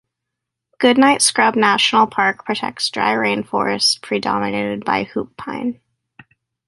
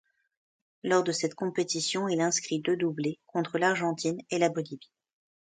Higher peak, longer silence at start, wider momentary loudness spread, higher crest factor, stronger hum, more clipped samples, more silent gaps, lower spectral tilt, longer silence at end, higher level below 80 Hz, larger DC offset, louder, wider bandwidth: first, -2 dBFS vs -10 dBFS; about the same, 0.8 s vs 0.85 s; first, 12 LU vs 7 LU; about the same, 18 dB vs 20 dB; neither; neither; neither; second, -2.5 dB/octave vs -4 dB/octave; first, 0.95 s vs 0.8 s; first, -60 dBFS vs -76 dBFS; neither; first, -17 LUFS vs -29 LUFS; first, 11.5 kHz vs 9.6 kHz